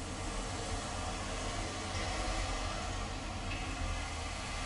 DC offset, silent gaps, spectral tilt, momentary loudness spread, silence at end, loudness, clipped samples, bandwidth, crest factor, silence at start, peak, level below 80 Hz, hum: under 0.1%; none; -3.5 dB/octave; 3 LU; 0 s; -39 LUFS; under 0.1%; 11.5 kHz; 14 dB; 0 s; -22 dBFS; -42 dBFS; none